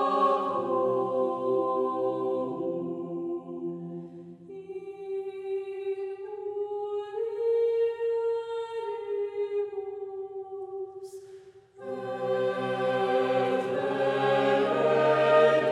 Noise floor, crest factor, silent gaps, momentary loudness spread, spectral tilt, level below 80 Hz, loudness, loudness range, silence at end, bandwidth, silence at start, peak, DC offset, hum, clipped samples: -50 dBFS; 18 dB; none; 15 LU; -6.5 dB/octave; -80 dBFS; -28 LUFS; 10 LU; 0 s; 10.5 kHz; 0 s; -10 dBFS; under 0.1%; none; under 0.1%